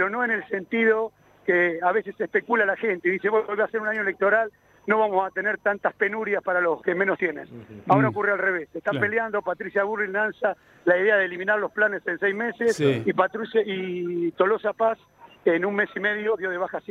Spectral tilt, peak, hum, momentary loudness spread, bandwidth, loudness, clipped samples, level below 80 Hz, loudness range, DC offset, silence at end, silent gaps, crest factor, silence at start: -6.5 dB/octave; -4 dBFS; none; 7 LU; 11 kHz; -24 LUFS; under 0.1%; -70 dBFS; 1 LU; under 0.1%; 0.1 s; none; 20 dB; 0 s